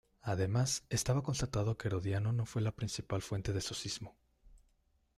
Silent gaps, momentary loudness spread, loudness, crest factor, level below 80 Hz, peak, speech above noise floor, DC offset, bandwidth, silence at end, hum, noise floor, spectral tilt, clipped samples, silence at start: none; 7 LU; -36 LUFS; 16 dB; -56 dBFS; -20 dBFS; 39 dB; under 0.1%; 14 kHz; 0.6 s; none; -74 dBFS; -5 dB/octave; under 0.1%; 0.25 s